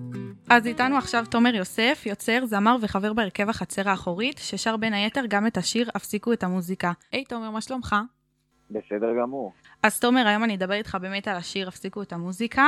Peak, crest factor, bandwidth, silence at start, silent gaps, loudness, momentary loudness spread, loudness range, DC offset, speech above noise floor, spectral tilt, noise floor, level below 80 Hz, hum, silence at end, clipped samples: -2 dBFS; 24 dB; 15 kHz; 0 s; none; -25 LUFS; 12 LU; 6 LU; under 0.1%; 44 dB; -4 dB/octave; -68 dBFS; -58 dBFS; none; 0 s; under 0.1%